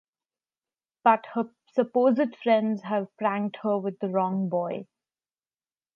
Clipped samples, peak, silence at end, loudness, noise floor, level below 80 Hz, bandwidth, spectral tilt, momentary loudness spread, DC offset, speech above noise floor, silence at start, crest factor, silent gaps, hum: under 0.1%; -6 dBFS; 1.1 s; -26 LUFS; under -90 dBFS; -82 dBFS; 6.4 kHz; -9 dB/octave; 8 LU; under 0.1%; over 65 dB; 1.05 s; 22 dB; none; none